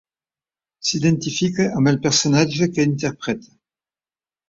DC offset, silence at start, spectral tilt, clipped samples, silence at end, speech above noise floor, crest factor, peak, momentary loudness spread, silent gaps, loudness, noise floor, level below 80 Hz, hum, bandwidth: under 0.1%; 0.85 s; -4.5 dB/octave; under 0.1%; 1.1 s; over 71 dB; 18 dB; -2 dBFS; 9 LU; none; -19 LUFS; under -90 dBFS; -56 dBFS; none; 7.8 kHz